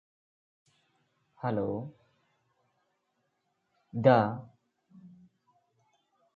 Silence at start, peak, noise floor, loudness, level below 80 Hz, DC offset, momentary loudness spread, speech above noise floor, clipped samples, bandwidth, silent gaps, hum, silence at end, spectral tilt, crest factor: 1.45 s; -8 dBFS; -79 dBFS; -28 LUFS; -70 dBFS; under 0.1%; 19 LU; 51 dB; under 0.1%; 6.8 kHz; none; none; 1.3 s; -6.5 dB/octave; 26 dB